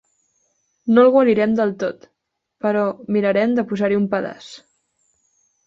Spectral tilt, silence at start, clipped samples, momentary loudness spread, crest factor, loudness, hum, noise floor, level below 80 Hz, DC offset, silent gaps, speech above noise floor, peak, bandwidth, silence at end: -7.5 dB/octave; 0.85 s; under 0.1%; 16 LU; 16 dB; -18 LUFS; none; -76 dBFS; -64 dBFS; under 0.1%; none; 59 dB; -4 dBFS; 7.6 kHz; 1.1 s